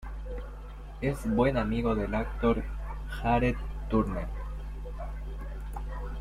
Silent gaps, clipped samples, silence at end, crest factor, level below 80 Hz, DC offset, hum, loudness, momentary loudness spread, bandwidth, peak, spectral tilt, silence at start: none; under 0.1%; 0 s; 18 dB; -36 dBFS; under 0.1%; none; -32 LUFS; 14 LU; 13 kHz; -12 dBFS; -8 dB/octave; 0 s